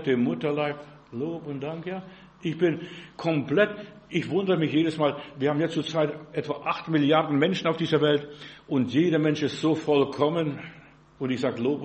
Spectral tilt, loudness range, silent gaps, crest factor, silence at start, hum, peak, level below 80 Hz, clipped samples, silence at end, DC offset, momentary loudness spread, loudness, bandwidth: -7 dB/octave; 5 LU; none; 20 dB; 0 s; none; -6 dBFS; -66 dBFS; under 0.1%; 0 s; under 0.1%; 12 LU; -26 LUFS; 8.4 kHz